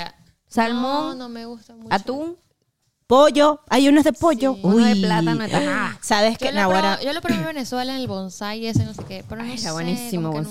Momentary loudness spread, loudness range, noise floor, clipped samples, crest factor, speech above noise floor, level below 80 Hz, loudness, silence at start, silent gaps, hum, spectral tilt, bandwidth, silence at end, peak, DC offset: 16 LU; 8 LU; -70 dBFS; under 0.1%; 16 dB; 50 dB; -50 dBFS; -20 LUFS; 0 s; none; none; -5 dB/octave; 16 kHz; 0 s; -4 dBFS; 0.9%